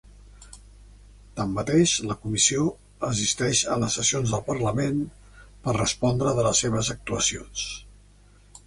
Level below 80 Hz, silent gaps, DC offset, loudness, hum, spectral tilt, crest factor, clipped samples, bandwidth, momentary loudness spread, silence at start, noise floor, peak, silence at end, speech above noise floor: -48 dBFS; none; under 0.1%; -24 LUFS; 50 Hz at -45 dBFS; -3.5 dB/octave; 20 dB; under 0.1%; 11.5 kHz; 11 LU; 0.25 s; -54 dBFS; -6 dBFS; 0.1 s; 29 dB